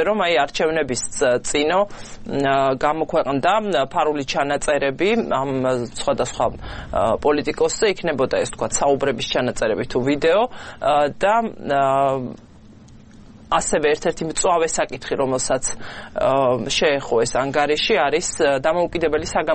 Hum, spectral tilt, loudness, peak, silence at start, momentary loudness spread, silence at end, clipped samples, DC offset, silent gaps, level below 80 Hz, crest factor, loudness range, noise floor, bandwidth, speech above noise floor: none; -3.5 dB/octave; -20 LUFS; -2 dBFS; 0 s; 5 LU; 0 s; under 0.1%; under 0.1%; none; -42 dBFS; 18 dB; 2 LU; -44 dBFS; 8.8 kHz; 25 dB